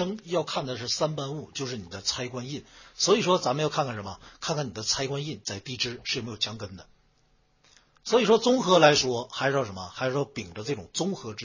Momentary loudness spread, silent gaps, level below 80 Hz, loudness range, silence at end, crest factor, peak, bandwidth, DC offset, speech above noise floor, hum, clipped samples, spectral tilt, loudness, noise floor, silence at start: 14 LU; none; -60 dBFS; 7 LU; 0 s; 24 dB; -4 dBFS; 7.4 kHz; under 0.1%; 38 dB; none; under 0.1%; -3.5 dB/octave; -27 LUFS; -66 dBFS; 0 s